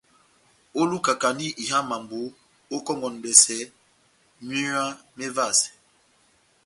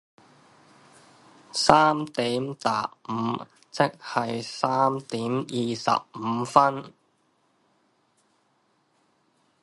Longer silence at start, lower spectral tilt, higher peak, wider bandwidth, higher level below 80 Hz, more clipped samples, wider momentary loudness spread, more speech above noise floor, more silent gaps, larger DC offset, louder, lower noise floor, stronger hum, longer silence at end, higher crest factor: second, 0.75 s vs 1.55 s; second, -1.5 dB/octave vs -4.5 dB/octave; about the same, 0 dBFS vs 0 dBFS; about the same, 12 kHz vs 11.5 kHz; second, -70 dBFS vs -62 dBFS; neither; first, 19 LU vs 11 LU; second, 38 dB vs 44 dB; neither; neither; first, -22 LUFS vs -25 LUFS; second, -63 dBFS vs -68 dBFS; neither; second, 0.95 s vs 2.75 s; about the same, 26 dB vs 28 dB